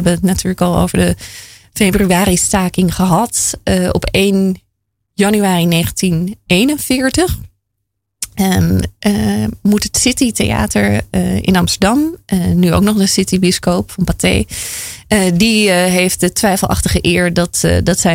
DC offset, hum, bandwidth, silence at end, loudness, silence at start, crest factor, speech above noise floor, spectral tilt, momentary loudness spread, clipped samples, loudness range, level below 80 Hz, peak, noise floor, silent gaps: under 0.1%; none; 16.5 kHz; 0 s; -13 LUFS; 0 s; 12 dB; 60 dB; -4.5 dB/octave; 6 LU; under 0.1%; 2 LU; -30 dBFS; -2 dBFS; -72 dBFS; none